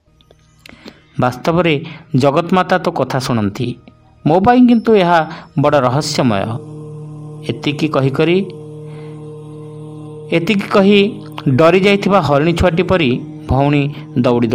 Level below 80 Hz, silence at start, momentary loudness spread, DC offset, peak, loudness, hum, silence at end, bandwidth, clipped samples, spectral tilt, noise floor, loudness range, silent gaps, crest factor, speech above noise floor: -40 dBFS; 0.85 s; 20 LU; under 0.1%; 0 dBFS; -14 LUFS; none; 0 s; 16 kHz; under 0.1%; -6.5 dB/octave; -49 dBFS; 6 LU; none; 14 dB; 36 dB